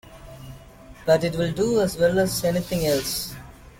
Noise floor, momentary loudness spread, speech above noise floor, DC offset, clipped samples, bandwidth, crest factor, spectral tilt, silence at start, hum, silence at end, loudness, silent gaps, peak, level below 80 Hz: -45 dBFS; 21 LU; 23 dB; under 0.1%; under 0.1%; 17 kHz; 18 dB; -5 dB/octave; 0.05 s; none; 0.1 s; -23 LUFS; none; -6 dBFS; -46 dBFS